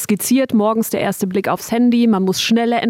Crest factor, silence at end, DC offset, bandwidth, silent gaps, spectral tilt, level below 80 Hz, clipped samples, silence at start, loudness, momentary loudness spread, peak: 10 dB; 0 s; under 0.1%; 16.5 kHz; none; -4.5 dB/octave; -58 dBFS; under 0.1%; 0 s; -16 LUFS; 5 LU; -6 dBFS